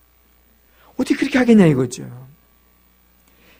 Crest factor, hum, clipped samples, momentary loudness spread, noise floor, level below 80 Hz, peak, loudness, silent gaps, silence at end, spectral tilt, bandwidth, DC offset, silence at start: 18 dB; 60 Hz at -45 dBFS; under 0.1%; 22 LU; -55 dBFS; -52 dBFS; -2 dBFS; -16 LUFS; none; 1.35 s; -6.5 dB/octave; 15.5 kHz; under 0.1%; 1 s